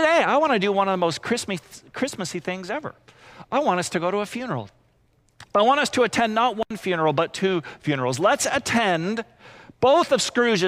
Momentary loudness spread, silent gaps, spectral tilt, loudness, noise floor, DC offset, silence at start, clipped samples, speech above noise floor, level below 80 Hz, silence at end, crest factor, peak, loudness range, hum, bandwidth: 12 LU; none; -4 dB/octave; -22 LUFS; -62 dBFS; under 0.1%; 0 s; under 0.1%; 40 dB; -62 dBFS; 0 s; 16 dB; -8 dBFS; 5 LU; none; 16 kHz